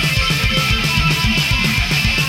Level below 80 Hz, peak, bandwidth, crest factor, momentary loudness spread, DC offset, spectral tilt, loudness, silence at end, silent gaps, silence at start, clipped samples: -24 dBFS; -2 dBFS; 17 kHz; 14 dB; 1 LU; under 0.1%; -3.5 dB/octave; -15 LUFS; 0 s; none; 0 s; under 0.1%